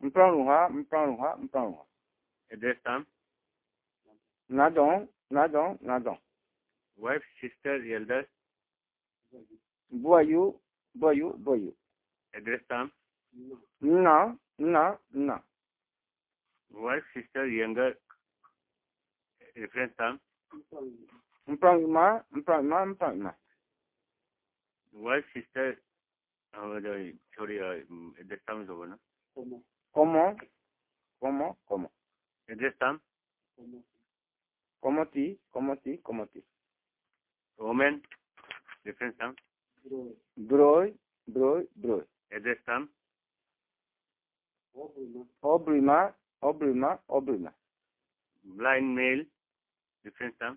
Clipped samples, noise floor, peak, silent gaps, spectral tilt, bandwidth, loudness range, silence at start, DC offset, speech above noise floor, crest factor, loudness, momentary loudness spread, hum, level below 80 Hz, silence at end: under 0.1%; under -90 dBFS; -6 dBFS; none; -4.5 dB/octave; 4 kHz; 9 LU; 0 s; under 0.1%; over 61 dB; 24 dB; -29 LUFS; 22 LU; none; -72 dBFS; 0 s